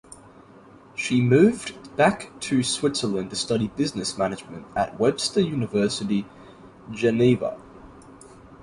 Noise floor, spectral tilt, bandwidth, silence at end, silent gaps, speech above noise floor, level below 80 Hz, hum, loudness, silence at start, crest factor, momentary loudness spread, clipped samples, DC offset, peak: -49 dBFS; -5 dB/octave; 11.5 kHz; 0.1 s; none; 26 dB; -54 dBFS; none; -23 LUFS; 0.1 s; 20 dB; 13 LU; under 0.1%; under 0.1%; -6 dBFS